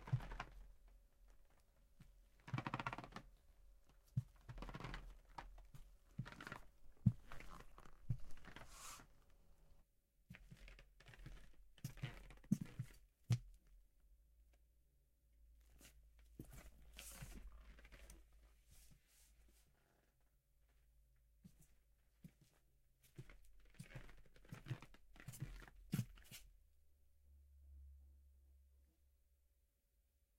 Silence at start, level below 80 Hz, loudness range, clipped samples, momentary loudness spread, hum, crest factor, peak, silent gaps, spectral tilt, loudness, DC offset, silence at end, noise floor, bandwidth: 0 s; -64 dBFS; 15 LU; under 0.1%; 22 LU; none; 32 dB; -20 dBFS; none; -6 dB/octave; -51 LUFS; under 0.1%; 1.55 s; -82 dBFS; 16 kHz